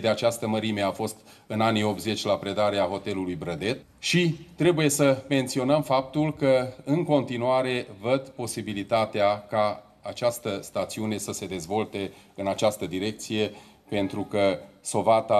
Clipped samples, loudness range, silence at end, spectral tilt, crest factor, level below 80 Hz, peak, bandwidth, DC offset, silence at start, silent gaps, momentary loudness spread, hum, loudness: under 0.1%; 6 LU; 0 s; -5 dB/octave; 18 dB; -62 dBFS; -8 dBFS; 13.5 kHz; under 0.1%; 0 s; none; 9 LU; none; -26 LUFS